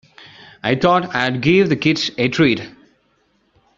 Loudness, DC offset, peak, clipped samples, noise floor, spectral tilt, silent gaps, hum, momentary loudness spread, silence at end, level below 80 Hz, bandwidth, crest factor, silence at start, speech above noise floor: -17 LUFS; under 0.1%; -2 dBFS; under 0.1%; -62 dBFS; -4 dB/octave; none; none; 9 LU; 1.1 s; -52 dBFS; 7.6 kHz; 18 dB; 0.65 s; 45 dB